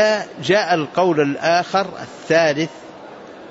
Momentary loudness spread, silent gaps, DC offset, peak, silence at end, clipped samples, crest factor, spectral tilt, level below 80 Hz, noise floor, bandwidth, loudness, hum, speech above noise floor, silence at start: 21 LU; none; under 0.1%; -4 dBFS; 0 s; under 0.1%; 16 dB; -4.5 dB/octave; -64 dBFS; -37 dBFS; 8 kHz; -18 LUFS; none; 20 dB; 0 s